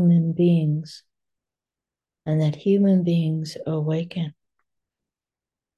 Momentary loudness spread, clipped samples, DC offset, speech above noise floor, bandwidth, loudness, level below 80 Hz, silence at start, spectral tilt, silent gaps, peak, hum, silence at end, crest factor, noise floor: 12 LU; under 0.1%; under 0.1%; over 69 dB; 8.8 kHz; -22 LUFS; -68 dBFS; 0 s; -9 dB/octave; none; -10 dBFS; none; 1.45 s; 14 dB; under -90 dBFS